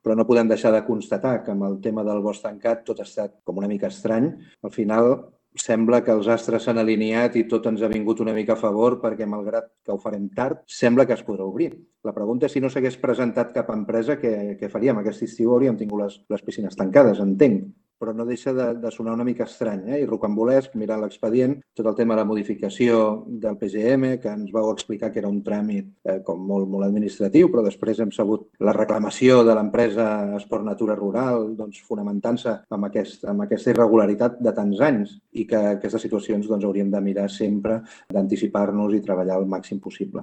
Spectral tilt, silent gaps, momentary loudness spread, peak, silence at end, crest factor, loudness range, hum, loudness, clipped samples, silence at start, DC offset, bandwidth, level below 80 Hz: -7 dB/octave; none; 10 LU; -2 dBFS; 0 s; 20 dB; 4 LU; none; -22 LUFS; under 0.1%; 0.05 s; under 0.1%; 8.8 kHz; -62 dBFS